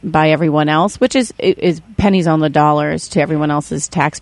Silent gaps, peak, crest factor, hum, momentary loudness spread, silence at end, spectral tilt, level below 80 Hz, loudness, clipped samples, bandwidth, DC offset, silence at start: none; 0 dBFS; 14 dB; none; 5 LU; 0 s; -5.5 dB/octave; -40 dBFS; -15 LUFS; under 0.1%; 11.5 kHz; under 0.1%; 0.05 s